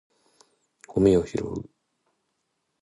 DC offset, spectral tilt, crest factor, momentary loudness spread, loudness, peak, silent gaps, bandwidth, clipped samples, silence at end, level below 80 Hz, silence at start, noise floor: under 0.1%; -7.5 dB/octave; 22 dB; 14 LU; -24 LUFS; -8 dBFS; none; 11 kHz; under 0.1%; 1.2 s; -50 dBFS; 0.9 s; -77 dBFS